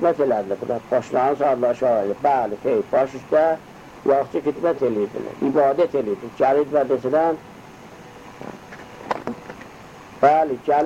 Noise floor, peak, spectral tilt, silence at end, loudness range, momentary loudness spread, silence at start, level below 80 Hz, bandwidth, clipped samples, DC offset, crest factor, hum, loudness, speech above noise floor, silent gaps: -42 dBFS; -2 dBFS; -7 dB/octave; 0 s; 5 LU; 21 LU; 0 s; -58 dBFS; 14 kHz; under 0.1%; under 0.1%; 18 dB; none; -21 LUFS; 22 dB; none